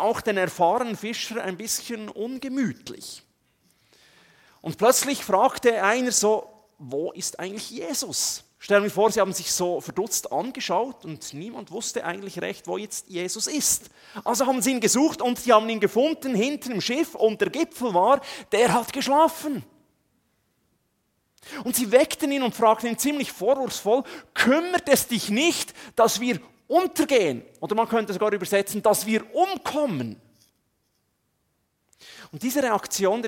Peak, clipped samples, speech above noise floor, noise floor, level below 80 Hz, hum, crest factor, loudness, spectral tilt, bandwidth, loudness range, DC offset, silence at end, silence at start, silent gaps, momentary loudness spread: -4 dBFS; under 0.1%; 49 dB; -72 dBFS; -66 dBFS; none; 22 dB; -24 LUFS; -3 dB/octave; 17 kHz; 7 LU; under 0.1%; 0 s; 0 s; none; 12 LU